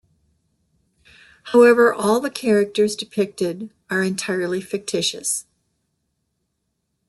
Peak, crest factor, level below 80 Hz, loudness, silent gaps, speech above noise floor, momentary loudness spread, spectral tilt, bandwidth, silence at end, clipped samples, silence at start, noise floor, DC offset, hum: -4 dBFS; 18 dB; -66 dBFS; -19 LUFS; none; 55 dB; 12 LU; -4 dB/octave; 12.5 kHz; 1.65 s; under 0.1%; 1.45 s; -74 dBFS; under 0.1%; none